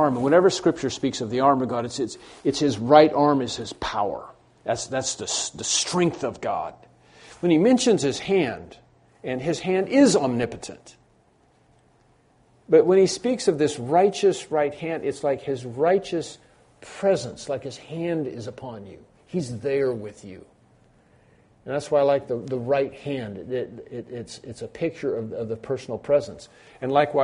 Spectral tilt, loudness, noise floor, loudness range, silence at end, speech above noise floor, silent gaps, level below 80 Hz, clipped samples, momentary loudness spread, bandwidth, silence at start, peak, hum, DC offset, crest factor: -4.5 dB/octave; -23 LUFS; -60 dBFS; 8 LU; 0 s; 37 dB; none; -58 dBFS; under 0.1%; 18 LU; 10.5 kHz; 0 s; -2 dBFS; none; under 0.1%; 22 dB